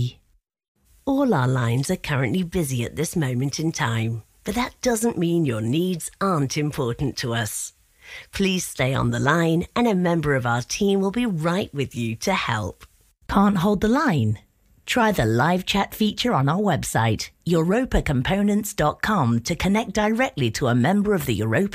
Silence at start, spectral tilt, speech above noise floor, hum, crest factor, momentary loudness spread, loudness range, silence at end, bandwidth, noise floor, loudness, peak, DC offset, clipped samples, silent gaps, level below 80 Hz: 0 s; -5.5 dB/octave; 41 dB; none; 18 dB; 7 LU; 3 LU; 0 s; 16 kHz; -63 dBFS; -22 LUFS; -4 dBFS; under 0.1%; under 0.1%; 0.68-0.75 s; -42 dBFS